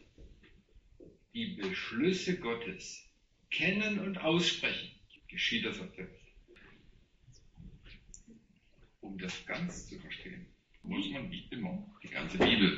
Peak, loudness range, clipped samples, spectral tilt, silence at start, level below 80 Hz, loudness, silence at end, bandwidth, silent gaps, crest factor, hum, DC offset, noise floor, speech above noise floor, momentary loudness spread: -14 dBFS; 13 LU; under 0.1%; -3 dB/octave; 0.2 s; -60 dBFS; -35 LUFS; 0 s; 8 kHz; none; 22 dB; none; under 0.1%; -65 dBFS; 30 dB; 23 LU